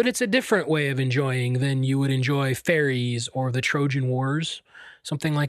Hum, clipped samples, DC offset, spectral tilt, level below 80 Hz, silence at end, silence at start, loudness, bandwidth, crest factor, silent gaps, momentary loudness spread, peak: none; under 0.1%; under 0.1%; -5.5 dB/octave; -64 dBFS; 0 s; 0 s; -24 LUFS; 14.5 kHz; 18 dB; none; 6 LU; -6 dBFS